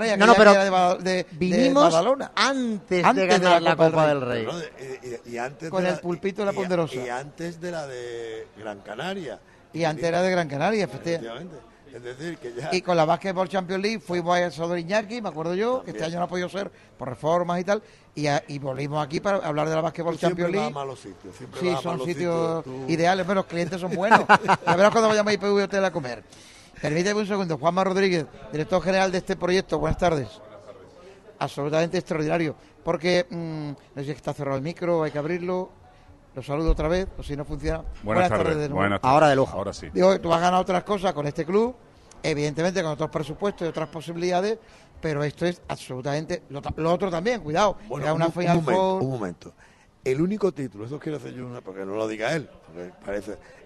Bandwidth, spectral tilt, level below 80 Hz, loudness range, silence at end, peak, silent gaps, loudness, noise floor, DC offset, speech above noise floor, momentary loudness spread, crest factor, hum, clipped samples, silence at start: 12.5 kHz; -5.5 dB/octave; -44 dBFS; 8 LU; 0.25 s; 0 dBFS; none; -24 LUFS; -51 dBFS; under 0.1%; 27 dB; 16 LU; 24 dB; none; under 0.1%; 0 s